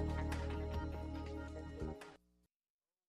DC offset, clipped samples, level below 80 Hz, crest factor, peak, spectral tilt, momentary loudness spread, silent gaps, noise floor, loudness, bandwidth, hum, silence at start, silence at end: under 0.1%; under 0.1%; -48 dBFS; 16 dB; -28 dBFS; -7 dB/octave; 8 LU; none; under -90 dBFS; -45 LUFS; 12 kHz; none; 0 s; 0.95 s